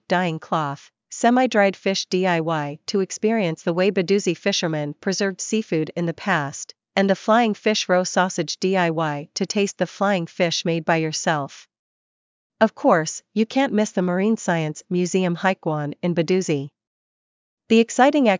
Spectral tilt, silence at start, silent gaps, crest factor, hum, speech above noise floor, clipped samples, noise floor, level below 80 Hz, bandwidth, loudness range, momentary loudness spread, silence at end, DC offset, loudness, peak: -5 dB/octave; 0.1 s; 11.79-12.50 s, 16.87-17.57 s; 20 dB; none; over 69 dB; under 0.1%; under -90 dBFS; -74 dBFS; 7.6 kHz; 2 LU; 8 LU; 0 s; under 0.1%; -21 LUFS; -2 dBFS